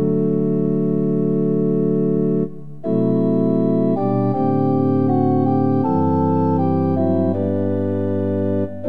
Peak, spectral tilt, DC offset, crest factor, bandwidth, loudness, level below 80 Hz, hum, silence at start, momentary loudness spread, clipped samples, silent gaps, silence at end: -4 dBFS; -12.5 dB/octave; 2%; 12 dB; 5 kHz; -18 LUFS; -66 dBFS; none; 0 s; 3 LU; under 0.1%; none; 0 s